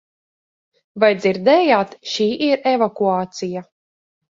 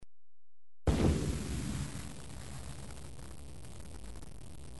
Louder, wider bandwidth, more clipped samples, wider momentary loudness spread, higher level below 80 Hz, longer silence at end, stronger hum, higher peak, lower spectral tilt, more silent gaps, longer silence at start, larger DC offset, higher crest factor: first, -18 LUFS vs -37 LUFS; second, 7.6 kHz vs 11.5 kHz; neither; second, 12 LU vs 19 LU; second, -66 dBFS vs -44 dBFS; first, 0.7 s vs 0 s; neither; first, -2 dBFS vs -16 dBFS; about the same, -5 dB/octave vs -6 dB/octave; neither; first, 0.95 s vs 0 s; second, under 0.1% vs 0.5%; about the same, 18 dB vs 22 dB